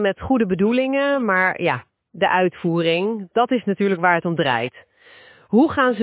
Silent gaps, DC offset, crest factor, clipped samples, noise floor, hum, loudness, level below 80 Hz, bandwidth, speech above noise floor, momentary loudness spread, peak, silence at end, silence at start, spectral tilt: none; under 0.1%; 16 dB; under 0.1%; -48 dBFS; none; -19 LUFS; -52 dBFS; 4 kHz; 29 dB; 5 LU; -4 dBFS; 0 s; 0 s; -10 dB/octave